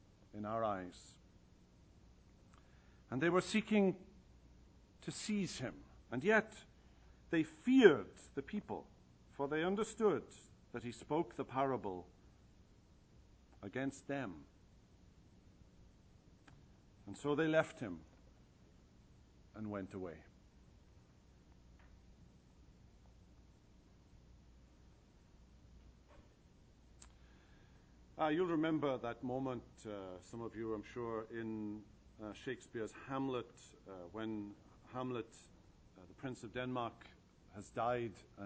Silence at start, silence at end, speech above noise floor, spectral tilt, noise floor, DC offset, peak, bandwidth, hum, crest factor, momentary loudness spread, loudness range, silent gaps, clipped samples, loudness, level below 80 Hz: 0.35 s; 0 s; 27 dB; -6 dB/octave; -66 dBFS; under 0.1%; -12 dBFS; 9.6 kHz; none; 30 dB; 22 LU; 14 LU; none; under 0.1%; -40 LUFS; -68 dBFS